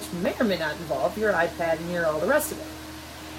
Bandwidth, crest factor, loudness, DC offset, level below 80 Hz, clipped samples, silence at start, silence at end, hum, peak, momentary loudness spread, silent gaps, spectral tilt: 17 kHz; 16 dB; -26 LUFS; under 0.1%; -50 dBFS; under 0.1%; 0 s; 0 s; none; -10 dBFS; 14 LU; none; -4.5 dB/octave